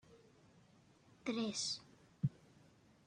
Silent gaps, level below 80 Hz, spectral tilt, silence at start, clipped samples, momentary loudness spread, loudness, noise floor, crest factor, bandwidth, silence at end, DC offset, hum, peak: none; -78 dBFS; -4 dB/octave; 0.1 s; under 0.1%; 7 LU; -42 LUFS; -68 dBFS; 22 dB; 11 kHz; 0.75 s; under 0.1%; none; -24 dBFS